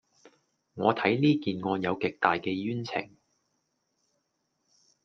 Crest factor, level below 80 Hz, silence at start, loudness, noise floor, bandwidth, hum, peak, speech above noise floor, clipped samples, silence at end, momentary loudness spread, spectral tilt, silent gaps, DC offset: 26 dB; -72 dBFS; 0.75 s; -28 LUFS; -78 dBFS; 6.6 kHz; none; -6 dBFS; 50 dB; under 0.1%; 2 s; 10 LU; -7 dB/octave; none; under 0.1%